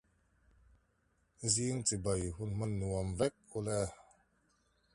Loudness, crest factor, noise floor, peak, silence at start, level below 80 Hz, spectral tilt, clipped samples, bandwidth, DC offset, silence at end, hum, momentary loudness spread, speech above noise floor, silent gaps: -36 LUFS; 22 dB; -76 dBFS; -18 dBFS; 1.4 s; -54 dBFS; -4.5 dB/octave; under 0.1%; 11.5 kHz; under 0.1%; 0.9 s; none; 7 LU; 40 dB; none